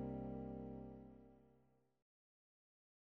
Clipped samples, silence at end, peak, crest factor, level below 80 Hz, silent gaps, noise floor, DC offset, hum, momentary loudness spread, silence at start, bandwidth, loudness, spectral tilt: under 0.1%; 1.5 s; -36 dBFS; 18 dB; -66 dBFS; none; -77 dBFS; under 0.1%; 50 Hz at -100 dBFS; 16 LU; 0 s; 4.1 kHz; -51 LUFS; -10.5 dB/octave